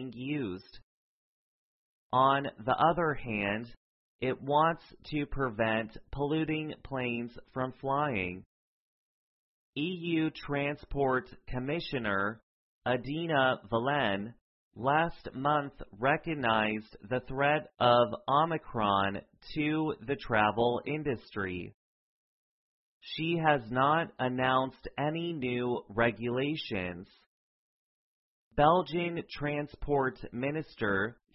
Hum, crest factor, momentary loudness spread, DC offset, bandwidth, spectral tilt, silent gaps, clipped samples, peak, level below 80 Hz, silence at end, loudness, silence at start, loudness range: none; 22 dB; 11 LU; under 0.1%; 5.8 kHz; -9.5 dB/octave; 0.83-2.10 s, 3.77-4.19 s, 8.46-9.73 s, 12.43-12.82 s, 14.41-14.71 s, 21.74-23.01 s, 27.26-28.51 s; under 0.1%; -10 dBFS; -56 dBFS; 0.2 s; -31 LUFS; 0 s; 5 LU